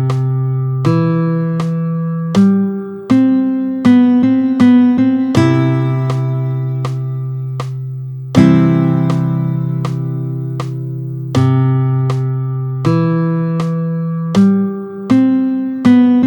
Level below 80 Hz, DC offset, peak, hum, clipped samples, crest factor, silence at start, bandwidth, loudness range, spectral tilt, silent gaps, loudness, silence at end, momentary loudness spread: -52 dBFS; under 0.1%; 0 dBFS; none; under 0.1%; 12 dB; 0 s; 8.6 kHz; 5 LU; -8.5 dB/octave; none; -14 LUFS; 0 s; 11 LU